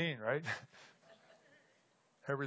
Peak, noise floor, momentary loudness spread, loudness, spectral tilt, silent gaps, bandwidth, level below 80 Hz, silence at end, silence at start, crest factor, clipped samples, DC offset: -22 dBFS; -74 dBFS; 23 LU; -40 LUFS; -5.5 dB/octave; none; 8 kHz; -84 dBFS; 0 s; 0 s; 20 dB; under 0.1%; under 0.1%